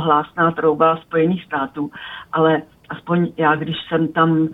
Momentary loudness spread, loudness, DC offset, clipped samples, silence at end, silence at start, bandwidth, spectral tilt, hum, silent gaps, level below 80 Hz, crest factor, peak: 11 LU; -19 LUFS; under 0.1%; under 0.1%; 0 s; 0 s; 4 kHz; -9 dB/octave; none; none; -58 dBFS; 18 dB; -2 dBFS